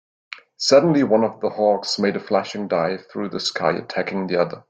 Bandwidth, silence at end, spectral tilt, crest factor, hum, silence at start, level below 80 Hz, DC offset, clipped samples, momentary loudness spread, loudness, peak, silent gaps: 9.2 kHz; 0.1 s; -4.5 dB/octave; 18 dB; none; 0.3 s; -64 dBFS; under 0.1%; under 0.1%; 12 LU; -20 LUFS; -2 dBFS; none